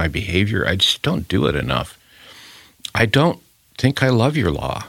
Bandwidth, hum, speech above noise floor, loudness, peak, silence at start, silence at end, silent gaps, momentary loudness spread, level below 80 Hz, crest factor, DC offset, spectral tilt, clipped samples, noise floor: 16.5 kHz; none; 26 dB; -18 LUFS; 0 dBFS; 0 s; 0 s; none; 11 LU; -40 dBFS; 20 dB; under 0.1%; -5.5 dB/octave; under 0.1%; -44 dBFS